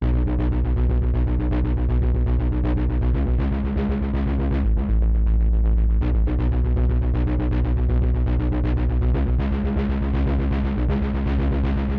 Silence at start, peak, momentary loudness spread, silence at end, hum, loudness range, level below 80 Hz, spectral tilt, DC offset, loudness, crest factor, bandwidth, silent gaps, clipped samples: 0 s; -12 dBFS; 2 LU; 0 s; none; 1 LU; -20 dBFS; -11 dB/octave; under 0.1%; -22 LUFS; 8 dB; 4.2 kHz; none; under 0.1%